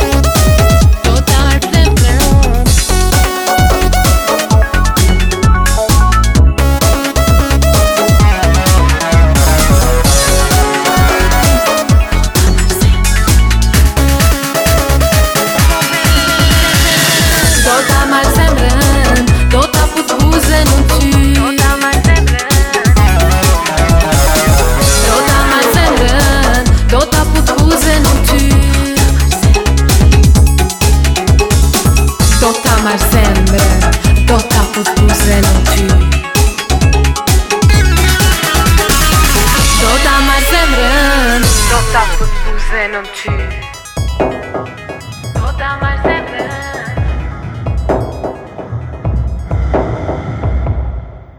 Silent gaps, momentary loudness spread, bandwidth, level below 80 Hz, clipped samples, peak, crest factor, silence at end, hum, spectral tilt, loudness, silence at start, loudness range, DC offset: none; 9 LU; over 20 kHz; -12 dBFS; under 0.1%; 0 dBFS; 8 dB; 0.2 s; none; -4.5 dB/octave; -10 LUFS; 0 s; 8 LU; under 0.1%